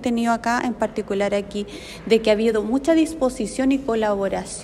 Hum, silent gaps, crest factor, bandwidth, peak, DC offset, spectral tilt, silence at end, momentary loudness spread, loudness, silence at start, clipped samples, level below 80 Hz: none; none; 16 dB; 13.5 kHz; -6 dBFS; under 0.1%; -5 dB/octave; 0 s; 7 LU; -21 LUFS; 0 s; under 0.1%; -46 dBFS